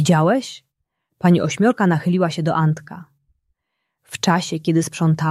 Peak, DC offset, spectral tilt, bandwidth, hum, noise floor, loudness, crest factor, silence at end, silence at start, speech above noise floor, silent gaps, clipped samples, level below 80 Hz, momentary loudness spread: -2 dBFS; under 0.1%; -6 dB/octave; 13 kHz; none; -77 dBFS; -19 LUFS; 18 dB; 0 s; 0 s; 59 dB; none; under 0.1%; -60 dBFS; 18 LU